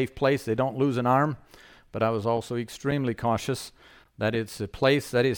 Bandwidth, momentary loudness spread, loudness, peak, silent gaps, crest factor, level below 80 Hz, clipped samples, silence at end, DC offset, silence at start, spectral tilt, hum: 19 kHz; 10 LU; -26 LUFS; -10 dBFS; none; 18 dB; -54 dBFS; under 0.1%; 0 s; under 0.1%; 0 s; -6 dB/octave; none